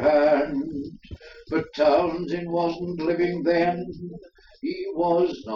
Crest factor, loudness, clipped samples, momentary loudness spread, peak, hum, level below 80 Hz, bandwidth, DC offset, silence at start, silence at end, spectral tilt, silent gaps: 16 dB; -24 LUFS; under 0.1%; 18 LU; -8 dBFS; none; -54 dBFS; 6.8 kHz; under 0.1%; 0 s; 0 s; -7.5 dB/octave; none